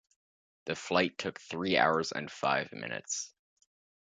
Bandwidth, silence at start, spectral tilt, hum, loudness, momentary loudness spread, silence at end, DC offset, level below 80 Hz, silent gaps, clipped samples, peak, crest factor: 9.4 kHz; 0.65 s; -3 dB/octave; none; -32 LUFS; 12 LU; 0.75 s; under 0.1%; -70 dBFS; none; under 0.1%; -10 dBFS; 24 dB